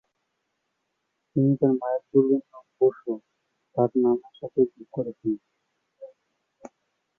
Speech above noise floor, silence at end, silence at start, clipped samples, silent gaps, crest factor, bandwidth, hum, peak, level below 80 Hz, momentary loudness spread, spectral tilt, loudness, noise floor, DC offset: 54 dB; 0.5 s; 1.35 s; under 0.1%; none; 20 dB; 3.5 kHz; none; -8 dBFS; -72 dBFS; 12 LU; -11.5 dB/octave; -25 LUFS; -78 dBFS; under 0.1%